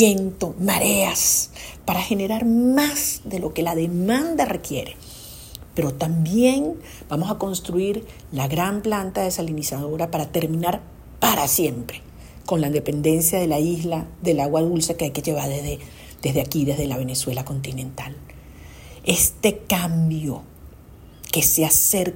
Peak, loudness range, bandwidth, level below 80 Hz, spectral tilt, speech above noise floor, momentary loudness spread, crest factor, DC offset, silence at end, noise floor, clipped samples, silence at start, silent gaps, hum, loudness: -2 dBFS; 5 LU; 16.5 kHz; -44 dBFS; -4 dB/octave; 23 dB; 15 LU; 20 dB; under 0.1%; 0 s; -44 dBFS; under 0.1%; 0 s; none; none; -21 LUFS